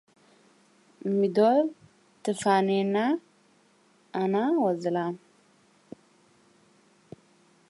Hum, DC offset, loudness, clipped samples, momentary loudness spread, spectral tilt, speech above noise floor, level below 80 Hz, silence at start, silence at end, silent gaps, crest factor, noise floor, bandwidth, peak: none; under 0.1%; -26 LUFS; under 0.1%; 13 LU; -6 dB/octave; 38 dB; -80 dBFS; 1.05 s; 2.5 s; none; 18 dB; -63 dBFS; 11.5 kHz; -10 dBFS